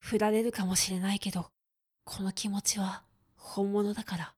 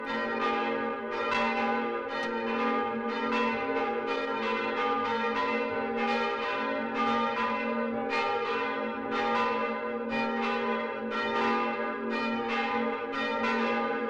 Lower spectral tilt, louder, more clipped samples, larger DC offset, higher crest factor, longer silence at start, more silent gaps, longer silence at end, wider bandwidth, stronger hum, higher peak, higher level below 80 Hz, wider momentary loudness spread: about the same, -4 dB/octave vs -5 dB/octave; about the same, -31 LUFS vs -30 LUFS; neither; neither; first, 18 dB vs 12 dB; about the same, 0.05 s vs 0 s; neither; about the same, 0.05 s vs 0 s; first, 18 kHz vs 8.6 kHz; neither; about the same, -14 dBFS vs -16 dBFS; about the same, -62 dBFS vs -66 dBFS; first, 12 LU vs 4 LU